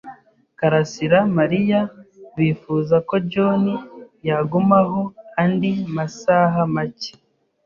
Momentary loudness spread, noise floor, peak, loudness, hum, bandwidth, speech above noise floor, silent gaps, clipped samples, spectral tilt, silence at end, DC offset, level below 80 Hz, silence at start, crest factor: 11 LU; -46 dBFS; -2 dBFS; -19 LUFS; none; 7.4 kHz; 28 dB; none; under 0.1%; -7.5 dB/octave; 0.55 s; under 0.1%; -58 dBFS; 0.05 s; 18 dB